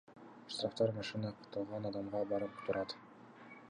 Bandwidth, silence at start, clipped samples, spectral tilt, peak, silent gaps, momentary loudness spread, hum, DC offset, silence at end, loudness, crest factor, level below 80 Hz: 10 kHz; 0.1 s; under 0.1%; -6 dB/octave; -22 dBFS; none; 20 LU; none; under 0.1%; 0 s; -40 LUFS; 18 dB; -72 dBFS